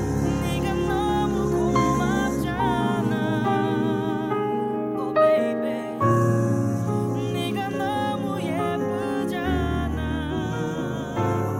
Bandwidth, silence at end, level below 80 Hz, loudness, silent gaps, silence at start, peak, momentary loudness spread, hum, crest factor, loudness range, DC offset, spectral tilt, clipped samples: 16 kHz; 0 s; -40 dBFS; -24 LUFS; none; 0 s; -8 dBFS; 6 LU; none; 16 dB; 3 LU; under 0.1%; -7 dB/octave; under 0.1%